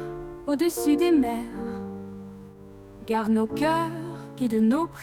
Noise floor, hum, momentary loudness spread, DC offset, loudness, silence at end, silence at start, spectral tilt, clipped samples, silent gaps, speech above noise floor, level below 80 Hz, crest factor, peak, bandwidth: -45 dBFS; none; 20 LU; under 0.1%; -25 LUFS; 0 s; 0 s; -5.5 dB/octave; under 0.1%; none; 22 dB; -54 dBFS; 14 dB; -12 dBFS; 18 kHz